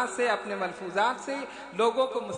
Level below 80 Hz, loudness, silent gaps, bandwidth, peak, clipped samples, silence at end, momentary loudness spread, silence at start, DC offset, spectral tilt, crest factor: -70 dBFS; -29 LUFS; none; 10.5 kHz; -12 dBFS; under 0.1%; 0 s; 9 LU; 0 s; under 0.1%; -3.5 dB/octave; 16 dB